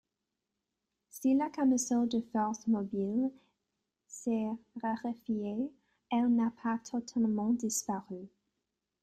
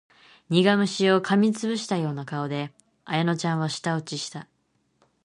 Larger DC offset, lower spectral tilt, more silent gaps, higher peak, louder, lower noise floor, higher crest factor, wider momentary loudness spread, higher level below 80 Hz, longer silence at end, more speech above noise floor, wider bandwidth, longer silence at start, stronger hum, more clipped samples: neither; about the same, -5 dB/octave vs -5.5 dB/octave; neither; second, -20 dBFS vs -4 dBFS; second, -33 LUFS vs -25 LUFS; first, -87 dBFS vs -69 dBFS; second, 14 dB vs 20 dB; second, 9 LU vs 12 LU; about the same, -72 dBFS vs -70 dBFS; about the same, 0.75 s vs 0.8 s; first, 55 dB vs 45 dB; first, 13.5 kHz vs 11 kHz; first, 1.15 s vs 0.5 s; neither; neither